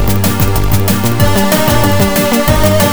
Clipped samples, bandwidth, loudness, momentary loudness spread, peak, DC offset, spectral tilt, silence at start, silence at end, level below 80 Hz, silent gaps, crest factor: under 0.1%; over 20 kHz; -11 LUFS; 2 LU; 0 dBFS; 10%; -5 dB/octave; 0 s; 0 s; -22 dBFS; none; 10 dB